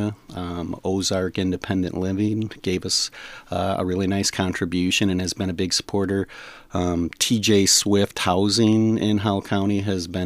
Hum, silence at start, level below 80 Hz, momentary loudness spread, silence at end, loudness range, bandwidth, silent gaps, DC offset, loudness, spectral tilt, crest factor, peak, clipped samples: none; 0 s; -50 dBFS; 11 LU; 0 s; 5 LU; 15.5 kHz; none; under 0.1%; -22 LUFS; -4 dB/octave; 16 dB; -6 dBFS; under 0.1%